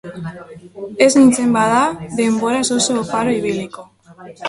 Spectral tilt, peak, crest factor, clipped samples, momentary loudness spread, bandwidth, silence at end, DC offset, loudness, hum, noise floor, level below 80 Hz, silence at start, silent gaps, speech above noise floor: -4 dB/octave; 0 dBFS; 16 dB; under 0.1%; 20 LU; 11.5 kHz; 0 s; under 0.1%; -15 LUFS; none; -40 dBFS; -54 dBFS; 0.05 s; none; 23 dB